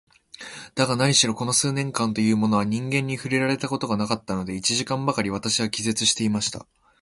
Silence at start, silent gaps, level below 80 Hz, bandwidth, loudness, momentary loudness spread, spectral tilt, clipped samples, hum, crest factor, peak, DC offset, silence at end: 0.4 s; none; -56 dBFS; 11.5 kHz; -23 LUFS; 9 LU; -3.5 dB/octave; under 0.1%; none; 20 dB; -4 dBFS; under 0.1%; 0.4 s